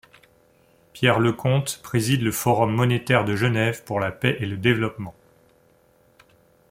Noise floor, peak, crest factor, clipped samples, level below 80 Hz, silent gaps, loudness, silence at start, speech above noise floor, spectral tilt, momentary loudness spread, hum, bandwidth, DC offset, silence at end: -59 dBFS; -2 dBFS; 20 dB; under 0.1%; -56 dBFS; none; -22 LUFS; 0.95 s; 37 dB; -5.5 dB/octave; 7 LU; none; 16.5 kHz; under 0.1%; 1.6 s